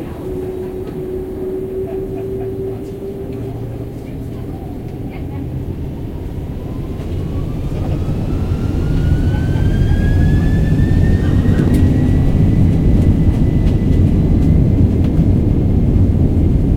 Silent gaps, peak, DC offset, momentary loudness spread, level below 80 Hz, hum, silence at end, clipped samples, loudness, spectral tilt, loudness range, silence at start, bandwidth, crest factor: none; 0 dBFS; under 0.1%; 13 LU; -20 dBFS; none; 0 s; under 0.1%; -16 LUFS; -9.5 dB/octave; 12 LU; 0 s; 10.5 kHz; 14 dB